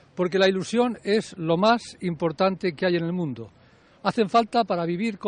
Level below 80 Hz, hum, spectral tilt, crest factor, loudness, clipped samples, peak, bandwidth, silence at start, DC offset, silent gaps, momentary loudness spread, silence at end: -64 dBFS; none; -6 dB/octave; 16 dB; -24 LUFS; under 0.1%; -8 dBFS; 10 kHz; 0.15 s; under 0.1%; none; 8 LU; 0 s